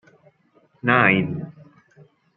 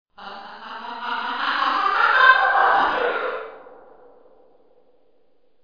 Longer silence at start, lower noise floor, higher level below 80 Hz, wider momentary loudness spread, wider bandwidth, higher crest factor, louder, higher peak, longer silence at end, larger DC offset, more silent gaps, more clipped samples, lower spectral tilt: first, 0.85 s vs 0.2 s; second, -60 dBFS vs -65 dBFS; about the same, -62 dBFS vs -60 dBFS; second, 18 LU vs 23 LU; second, 4.4 kHz vs 5.2 kHz; about the same, 22 dB vs 22 dB; about the same, -19 LUFS vs -18 LUFS; about the same, -2 dBFS vs 0 dBFS; second, 0.85 s vs 1.9 s; second, under 0.1% vs 0.3%; neither; neither; first, -9 dB/octave vs -2.5 dB/octave